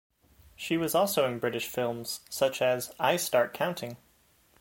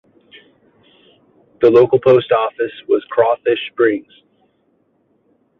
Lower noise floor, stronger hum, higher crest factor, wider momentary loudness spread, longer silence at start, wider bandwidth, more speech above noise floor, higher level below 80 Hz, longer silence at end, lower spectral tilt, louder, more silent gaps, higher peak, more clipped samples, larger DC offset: first, -65 dBFS vs -61 dBFS; neither; about the same, 20 dB vs 16 dB; about the same, 10 LU vs 9 LU; second, 0.6 s vs 1.6 s; first, 17 kHz vs 5.4 kHz; second, 36 dB vs 47 dB; second, -66 dBFS vs -58 dBFS; second, 0.65 s vs 1.6 s; second, -3.5 dB/octave vs -8 dB/octave; second, -29 LUFS vs -15 LUFS; neither; second, -10 dBFS vs -2 dBFS; neither; neither